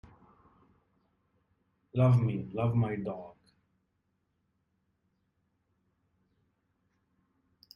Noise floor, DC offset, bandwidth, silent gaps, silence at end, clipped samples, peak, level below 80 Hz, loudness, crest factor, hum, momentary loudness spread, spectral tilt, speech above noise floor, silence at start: -79 dBFS; under 0.1%; 5.4 kHz; none; 4.45 s; under 0.1%; -16 dBFS; -66 dBFS; -30 LUFS; 20 dB; none; 14 LU; -10 dB/octave; 50 dB; 1.95 s